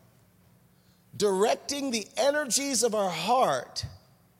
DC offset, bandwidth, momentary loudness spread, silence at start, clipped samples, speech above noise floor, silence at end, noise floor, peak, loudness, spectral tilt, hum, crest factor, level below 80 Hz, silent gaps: under 0.1%; 16.5 kHz; 12 LU; 1.15 s; under 0.1%; 35 dB; 0.45 s; -62 dBFS; -10 dBFS; -27 LUFS; -2.5 dB/octave; none; 18 dB; -62 dBFS; none